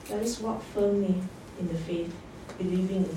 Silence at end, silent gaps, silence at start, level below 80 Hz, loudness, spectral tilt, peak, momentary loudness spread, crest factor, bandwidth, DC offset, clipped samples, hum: 0 s; none; 0 s; -54 dBFS; -31 LUFS; -6.5 dB/octave; -16 dBFS; 12 LU; 14 dB; 16 kHz; under 0.1%; under 0.1%; none